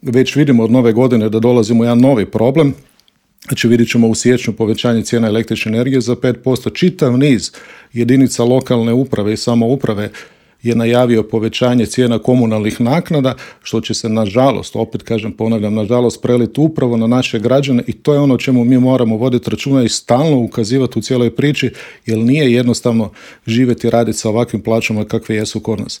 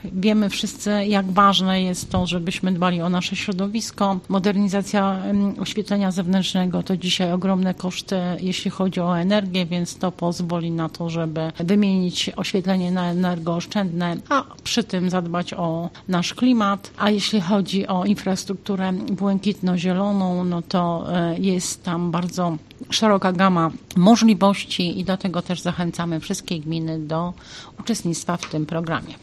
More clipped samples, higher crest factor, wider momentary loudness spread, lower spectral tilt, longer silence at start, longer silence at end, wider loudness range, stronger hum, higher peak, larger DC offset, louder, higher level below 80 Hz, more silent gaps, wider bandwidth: neither; second, 12 dB vs 18 dB; about the same, 7 LU vs 8 LU; about the same, -6 dB/octave vs -5.5 dB/octave; about the same, 0.05 s vs 0 s; about the same, 0.05 s vs 0.05 s; about the same, 2 LU vs 4 LU; neither; first, 0 dBFS vs -4 dBFS; neither; first, -14 LUFS vs -22 LUFS; about the same, -50 dBFS vs -52 dBFS; neither; first, 15.5 kHz vs 13 kHz